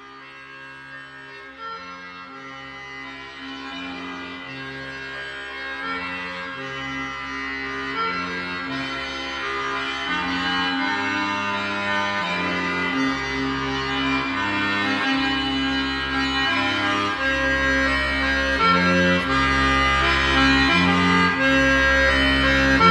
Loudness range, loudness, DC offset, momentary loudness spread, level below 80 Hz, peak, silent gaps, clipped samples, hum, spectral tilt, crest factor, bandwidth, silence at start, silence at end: 16 LU; -21 LUFS; under 0.1%; 18 LU; -38 dBFS; -4 dBFS; none; under 0.1%; none; -4.5 dB/octave; 18 dB; 11.5 kHz; 0 s; 0 s